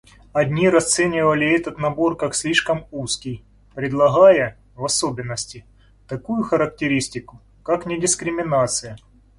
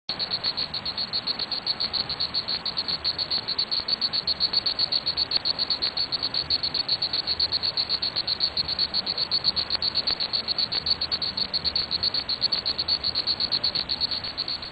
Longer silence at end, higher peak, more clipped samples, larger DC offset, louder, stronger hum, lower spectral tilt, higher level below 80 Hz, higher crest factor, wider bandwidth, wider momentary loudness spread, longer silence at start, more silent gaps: first, 0.4 s vs 0 s; first, -2 dBFS vs -6 dBFS; neither; neither; first, -20 LUFS vs -24 LUFS; neither; about the same, -4 dB/octave vs -4 dB/octave; about the same, -50 dBFS vs -52 dBFS; about the same, 18 dB vs 20 dB; first, 11.5 kHz vs 8.4 kHz; first, 15 LU vs 4 LU; first, 0.35 s vs 0.1 s; neither